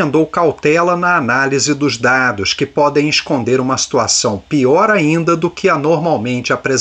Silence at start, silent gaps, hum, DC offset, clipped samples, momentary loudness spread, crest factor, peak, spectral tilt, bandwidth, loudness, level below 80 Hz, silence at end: 0 s; none; none; under 0.1%; under 0.1%; 4 LU; 12 dB; -2 dBFS; -4 dB/octave; 9.4 kHz; -13 LUFS; -50 dBFS; 0 s